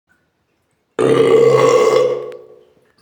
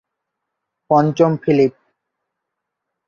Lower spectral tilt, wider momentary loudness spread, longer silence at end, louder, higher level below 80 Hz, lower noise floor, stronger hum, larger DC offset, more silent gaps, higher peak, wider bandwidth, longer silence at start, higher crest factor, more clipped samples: second, -5.5 dB/octave vs -8 dB/octave; first, 16 LU vs 3 LU; second, 0.65 s vs 1.4 s; first, -13 LUFS vs -16 LUFS; about the same, -62 dBFS vs -60 dBFS; second, -65 dBFS vs -79 dBFS; neither; neither; neither; about the same, -2 dBFS vs -2 dBFS; first, 16.5 kHz vs 7.2 kHz; about the same, 1 s vs 0.9 s; about the same, 14 dB vs 18 dB; neither